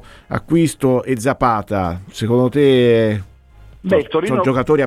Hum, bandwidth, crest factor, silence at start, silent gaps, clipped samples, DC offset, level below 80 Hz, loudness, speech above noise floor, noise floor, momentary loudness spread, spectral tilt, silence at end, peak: none; 15 kHz; 14 dB; 0.3 s; none; under 0.1%; under 0.1%; -42 dBFS; -16 LUFS; 27 dB; -43 dBFS; 11 LU; -6.5 dB/octave; 0 s; -2 dBFS